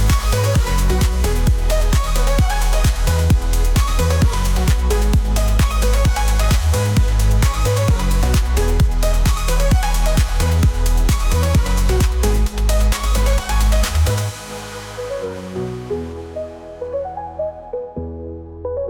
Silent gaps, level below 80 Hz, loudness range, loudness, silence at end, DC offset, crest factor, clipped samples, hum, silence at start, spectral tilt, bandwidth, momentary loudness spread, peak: none; -18 dBFS; 10 LU; -18 LUFS; 0 s; under 0.1%; 10 dB; under 0.1%; none; 0 s; -5 dB/octave; 18.5 kHz; 11 LU; -6 dBFS